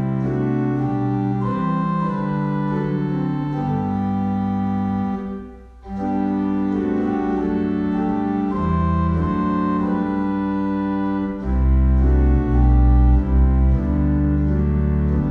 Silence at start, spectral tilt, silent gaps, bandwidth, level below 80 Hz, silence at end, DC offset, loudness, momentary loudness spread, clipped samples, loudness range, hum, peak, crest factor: 0 s; -10.5 dB/octave; none; 4.4 kHz; -22 dBFS; 0 s; under 0.1%; -20 LUFS; 5 LU; under 0.1%; 5 LU; none; -6 dBFS; 14 dB